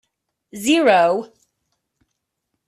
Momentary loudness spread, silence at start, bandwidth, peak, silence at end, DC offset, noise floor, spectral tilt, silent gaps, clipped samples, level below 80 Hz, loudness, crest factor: 13 LU; 0.55 s; 14 kHz; -4 dBFS; 1.4 s; under 0.1%; -77 dBFS; -3.5 dB/octave; none; under 0.1%; -66 dBFS; -17 LUFS; 18 dB